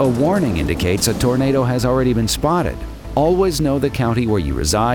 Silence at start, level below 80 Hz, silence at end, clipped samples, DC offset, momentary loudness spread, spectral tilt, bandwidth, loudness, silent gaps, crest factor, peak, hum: 0 s; -30 dBFS; 0 s; under 0.1%; 0.3%; 3 LU; -5.5 dB/octave; over 20 kHz; -17 LUFS; none; 14 dB; -2 dBFS; none